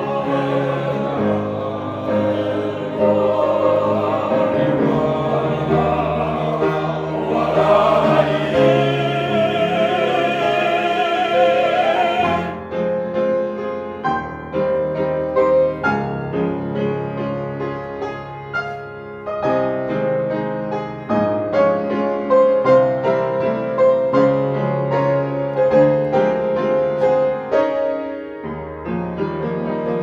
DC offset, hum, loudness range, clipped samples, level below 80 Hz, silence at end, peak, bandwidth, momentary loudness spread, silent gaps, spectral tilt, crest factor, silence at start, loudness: under 0.1%; none; 6 LU; under 0.1%; -48 dBFS; 0 s; -2 dBFS; 7.8 kHz; 10 LU; none; -7.5 dB/octave; 16 dB; 0 s; -18 LUFS